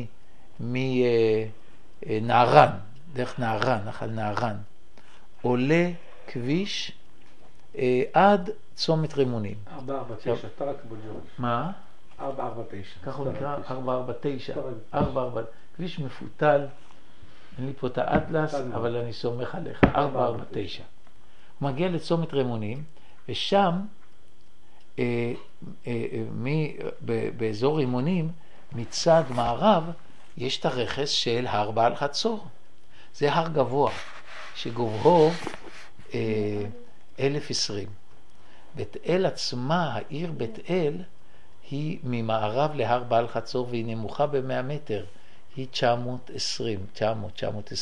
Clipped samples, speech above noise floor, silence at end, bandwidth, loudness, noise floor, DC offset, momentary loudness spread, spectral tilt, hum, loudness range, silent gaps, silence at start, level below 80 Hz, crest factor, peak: under 0.1%; 34 dB; 0 s; 11.5 kHz; -27 LUFS; -60 dBFS; 2%; 16 LU; -5.5 dB/octave; none; 7 LU; none; 0 s; -54 dBFS; 28 dB; 0 dBFS